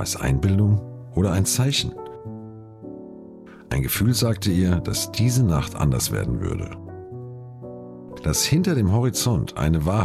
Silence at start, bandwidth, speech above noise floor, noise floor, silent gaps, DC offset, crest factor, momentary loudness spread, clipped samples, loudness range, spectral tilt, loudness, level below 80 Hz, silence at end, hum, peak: 0 s; 15.5 kHz; 22 dB; -43 dBFS; none; under 0.1%; 14 dB; 19 LU; under 0.1%; 3 LU; -5 dB/octave; -22 LUFS; -38 dBFS; 0 s; none; -10 dBFS